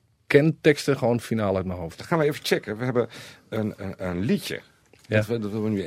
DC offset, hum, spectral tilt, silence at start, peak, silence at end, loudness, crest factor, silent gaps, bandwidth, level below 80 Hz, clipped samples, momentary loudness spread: under 0.1%; none; -6 dB/octave; 0.3 s; -2 dBFS; 0 s; -25 LUFS; 22 dB; none; 16 kHz; -58 dBFS; under 0.1%; 12 LU